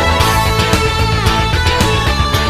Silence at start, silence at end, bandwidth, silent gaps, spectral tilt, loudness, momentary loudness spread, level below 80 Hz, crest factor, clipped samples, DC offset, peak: 0 s; 0 s; 15.5 kHz; none; -4.5 dB/octave; -13 LUFS; 2 LU; -20 dBFS; 12 dB; under 0.1%; under 0.1%; 0 dBFS